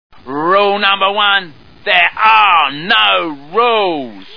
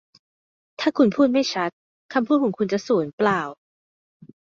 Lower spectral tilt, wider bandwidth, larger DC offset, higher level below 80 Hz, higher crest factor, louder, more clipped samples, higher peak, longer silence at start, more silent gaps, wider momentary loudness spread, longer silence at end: about the same, -5 dB/octave vs -5.5 dB/octave; second, 5.4 kHz vs 7.4 kHz; first, 2% vs under 0.1%; first, -56 dBFS vs -68 dBFS; about the same, 14 dB vs 18 dB; first, -11 LUFS vs -22 LUFS; first, 0.3% vs under 0.1%; first, 0 dBFS vs -6 dBFS; second, 0.25 s vs 0.8 s; second, none vs 1.73-2.09 s, 3.13-3.18 s; about the same, 10 LU vs 8 LU; second, 0 s vs 1.05 s